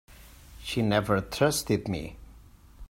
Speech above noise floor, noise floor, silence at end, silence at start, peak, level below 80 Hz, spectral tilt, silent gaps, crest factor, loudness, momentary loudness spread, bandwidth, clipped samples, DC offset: 25 dB; -52 dBFS; 0.05 s; 0.1 s; -10 dBFS; -48 dBFS; -5 dB/octave; none; 20 dB; -28 LUFS; 13 LU; 16.5 kHz; under 0.1%; under 0.1%